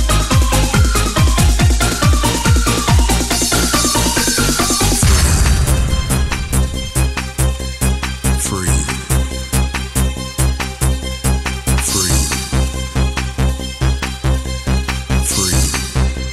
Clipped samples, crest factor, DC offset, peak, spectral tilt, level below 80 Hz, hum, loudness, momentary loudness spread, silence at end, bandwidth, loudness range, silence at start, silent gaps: under 0.1%; 12 dB; under 0.1%; -2 dBFS; -4 dB/octave; -18 dBFS; none; -15 LUFS; 6 LU; 0 s; 15.5 kHz; 5 LU; 0 s; none